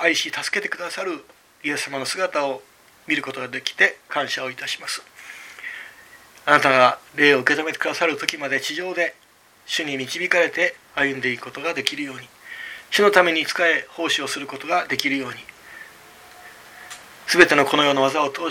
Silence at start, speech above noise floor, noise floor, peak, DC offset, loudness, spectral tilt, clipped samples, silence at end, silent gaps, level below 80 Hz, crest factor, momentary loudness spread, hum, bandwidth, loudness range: 0 s; 26 dB; -47 dBFS; 0 dBFS; under 0.1%; -20 LUFS; -2.5 dB/octave; under 0.1%; 0 s; none; -66 dBFS; 22 dB; 20 LU; none; 17 kHz; 6 LU